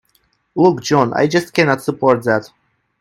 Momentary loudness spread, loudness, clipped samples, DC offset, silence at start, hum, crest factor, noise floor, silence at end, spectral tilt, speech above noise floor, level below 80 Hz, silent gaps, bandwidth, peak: 4 LU; -15 LUFS; under 0.1%; under 0.1%; 0.55 s; none; 16 dB; -61 dBFS; 0.55 s; -5.5 dB/octave; 46 dB; -56 dBFS; none; 16 kHz; 0 dBFS